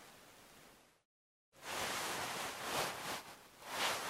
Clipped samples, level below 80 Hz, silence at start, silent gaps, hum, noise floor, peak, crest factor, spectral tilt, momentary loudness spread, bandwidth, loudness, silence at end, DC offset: under 0.1%; -74 dBFS; 0 s; 1.05-1.52 s; none; -64 dBFS; -24 dBFS; 20 dB; -1 dB/octave; 20 LU; 16 kHz; -41 LUFS; 0 s; under 0.1%